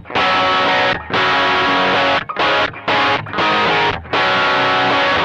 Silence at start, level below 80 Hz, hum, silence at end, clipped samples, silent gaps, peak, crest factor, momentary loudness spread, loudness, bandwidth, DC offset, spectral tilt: 0.05 s; -46 dBFS; none; 0 s; under 0.1%; none; -6 dBFS; 8 dB; 3 LU; -14 LUFS; 9 kHz; under 0.1%; -4 dB/octave